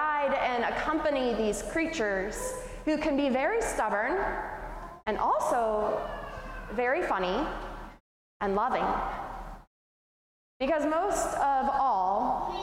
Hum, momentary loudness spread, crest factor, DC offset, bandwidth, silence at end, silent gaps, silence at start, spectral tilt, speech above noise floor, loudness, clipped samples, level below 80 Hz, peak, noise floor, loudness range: none; 13 LU; 14 dB; under 0.1%; 16.5 kHz; 0 s; 8.00-8.40 s, 9.67-10.60 s; 0 s; -4 dB/octave; over 62 dB; -29 LUFS; under 0.1%; -48 dBFS; -16 dBFS; under -90 dBFS; 3 LU